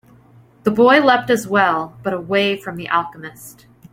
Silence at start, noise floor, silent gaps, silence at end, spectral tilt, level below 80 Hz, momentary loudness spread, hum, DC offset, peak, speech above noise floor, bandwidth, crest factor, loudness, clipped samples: 0.65 s; -48 dBFS; none; 0.4 s; -5 dB/octave; -58 dBFS; 14 LU; none; under 0.1%; -2 dBFS; 31 dB; 16.5 kHz; 16 dB; -17 LUFS; under 0.1%